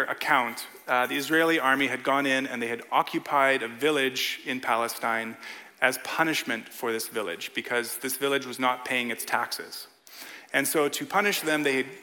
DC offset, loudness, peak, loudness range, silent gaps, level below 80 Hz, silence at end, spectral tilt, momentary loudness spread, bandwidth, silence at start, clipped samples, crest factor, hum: under 0.1%; -26 LUFS; -4 dBFS; 4 LU; none; -80 dBFS; 0 s; -2.5 dB/octave; 9 LU; 17.5 kHz; 0 s; under 0.1%; 22 dB; none